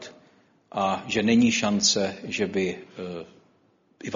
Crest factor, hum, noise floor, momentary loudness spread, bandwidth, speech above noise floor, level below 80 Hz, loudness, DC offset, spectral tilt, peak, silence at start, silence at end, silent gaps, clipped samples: 20 dB; none; -64 dBFS; 17 LU; 7.6 kHz; 39 dB; -62 dBFS; -24 LUFS; under 0.1%; -3.5 dB/octave; -6 dBFS; 0 s; 0 s; none; under 0.1%